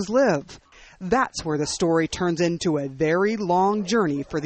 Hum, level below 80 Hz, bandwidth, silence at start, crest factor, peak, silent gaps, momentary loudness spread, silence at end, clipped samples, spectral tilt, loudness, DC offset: none; -50 dBFS; 8.8 kHz; 0 s; 16 dB; -8 dBFS; none; 5 LU; 0 s; under 0.1%; -5 dB/octave; -23 LUFS; under 0.1%